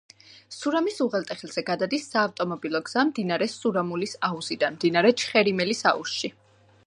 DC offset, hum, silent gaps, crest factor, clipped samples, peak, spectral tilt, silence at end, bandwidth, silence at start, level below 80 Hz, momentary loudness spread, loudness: under 0.1%; none; none; 20 dB; under 0.1%; -6 dBFS; -4.5 dB/octave; 0.55 s; 11 kHz; 0.3 s; -72 dBFS; 9 LU; -25 LUFS